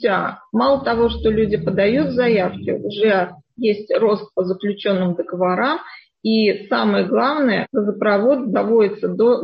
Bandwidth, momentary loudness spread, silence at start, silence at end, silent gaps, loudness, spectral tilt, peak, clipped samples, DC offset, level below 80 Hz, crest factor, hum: 5.6 kHz; 6 LU; 0 s; 0 s; none; -18 LUFS; -9 dB/octave; -4 dBFS; under 0.1%; under 0.1%; -44 dBFS; 14 dB; none